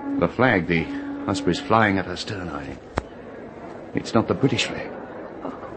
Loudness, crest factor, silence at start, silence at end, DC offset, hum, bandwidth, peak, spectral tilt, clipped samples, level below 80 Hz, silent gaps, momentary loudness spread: -23 LUFS; 22 dB; 0 s; 0 s; under 0.1%; none; 8.8 kHz; -2 dBFS; -5.5 dB/octave; under 0.1%; -48 dBFS; none; 18 LU